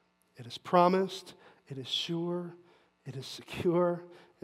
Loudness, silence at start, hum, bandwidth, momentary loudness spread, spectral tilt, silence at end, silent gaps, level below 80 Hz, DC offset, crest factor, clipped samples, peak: -31 LUFS; 0.4 s; none; 14 kHz; 21 LU; -6 dB/octave; 0.25 s; none; -72 dBFS; under 0.1%; 22 dB; under 0.1%; -10 dBFS